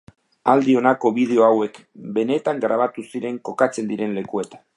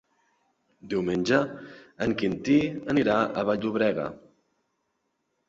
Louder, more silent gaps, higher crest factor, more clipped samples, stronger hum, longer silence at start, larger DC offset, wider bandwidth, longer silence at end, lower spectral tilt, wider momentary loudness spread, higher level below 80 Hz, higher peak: first, -20 LUFS vs -26 LUFS; neither; about the same, 18 dB vs 20 dB; neither; neither; second, 0.45 s vs 0.85 s; neither; first, 11.5 kHz vs 7.8 kHz; second, 0.2 s vs 1.3 s; about the same, -6.5 dB/octave vs -6.5 dB/octave; about the same, 12 LU vs 10 LU; second, -70 dBFS vs -60 dBFS; first, -2 dBFS vs -8 dBFS